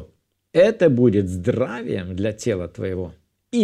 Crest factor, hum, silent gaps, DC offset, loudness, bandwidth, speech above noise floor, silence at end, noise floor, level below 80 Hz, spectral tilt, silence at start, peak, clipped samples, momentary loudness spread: 18 dB; none; none; under 0.1%; -21 LUFS; 12 kHz; 37 dB; 0 s; -57 dBFS; -52 dBFS; -7 dB/octave; 0 s; -2 dBFS; under 0.1%; 12 LU